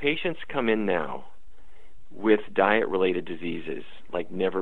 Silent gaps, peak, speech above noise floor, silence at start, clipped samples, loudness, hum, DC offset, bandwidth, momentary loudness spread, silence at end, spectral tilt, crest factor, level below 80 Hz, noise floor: none; -6 dBFS; 27 dB; 0 s; under 0.1%; -26 LUFS; none; 2%; 4.2 kHz; 13 LU; 0 s; -7.5 dB/octave; 22 dB; -56 dBFS; -54 dBFS